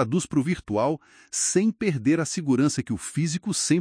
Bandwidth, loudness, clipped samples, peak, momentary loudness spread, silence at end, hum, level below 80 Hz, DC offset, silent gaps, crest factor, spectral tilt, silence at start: 10.5 kHz; -25 LUFS; under 0.1%; -8 dBFS; 6 LU; 0 s; none; -56 dBFS; under 0.1%; none; 16 dB; -5 dB/octave; 0 s